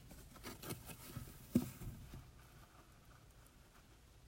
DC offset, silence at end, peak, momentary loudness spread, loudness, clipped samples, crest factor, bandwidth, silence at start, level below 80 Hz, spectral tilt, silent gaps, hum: under 0.1%; 0 s; -20 dBFS; 24 LU; -47 LUFS; under 0.1%; 28 dB; 16 kHz; 0 s; -62 dBFS; -5.5 dB/octave; none; none